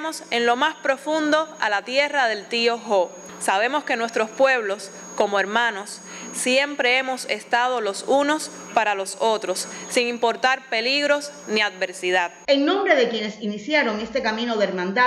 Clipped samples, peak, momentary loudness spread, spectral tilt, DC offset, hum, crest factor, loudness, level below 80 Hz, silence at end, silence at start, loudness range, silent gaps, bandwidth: under 0.1%; -4 dBFS; 7 LU; -2.5 dB/octave; under 0.1%; none; 18 dB; -22 LUFS; -68 dBFS; 0 s; 0 s; 1 LU; none; 14.5 kHz